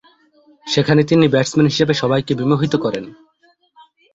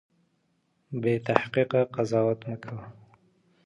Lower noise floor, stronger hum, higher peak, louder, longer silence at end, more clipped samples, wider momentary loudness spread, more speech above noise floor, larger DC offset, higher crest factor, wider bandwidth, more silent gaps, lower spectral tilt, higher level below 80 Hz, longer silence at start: second, -58 dBFS vs -72 dBFS; neither; about the same, 0 dBFS vs 0 dBFS; first, -16 LUFS vs -27 LUFS; first, 1 s vs 0.75 s; neither; second, 11 LU vs 14 LU; about the same, 42 dB vs 45 dB; neither; second, 18 dB vs 28 dB; second, 8 kHz vs 10.5 kHz; neither; second, -6 dB/octave vs -7.5 dB/octave; first, -52 dBFS vs -66 dBFS; second, 0.65 s vs 0.9 s